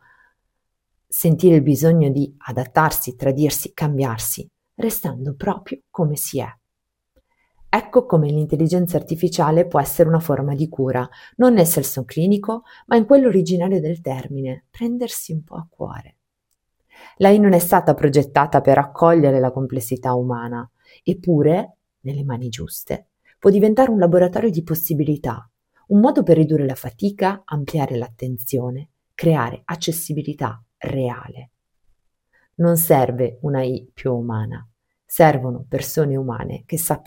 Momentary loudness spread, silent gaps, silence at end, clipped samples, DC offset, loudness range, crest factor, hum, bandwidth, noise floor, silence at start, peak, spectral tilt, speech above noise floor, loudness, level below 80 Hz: 14 LU; none; 0.1 s; under 0.1%; under 0.1%; 7 LU; 18 dB; none; 17 kHz; -78 dBFS; 1.1 s; 0 dBFS; -6.5 dB/octave; 60 dB; -19 LUFS; -50 dBFS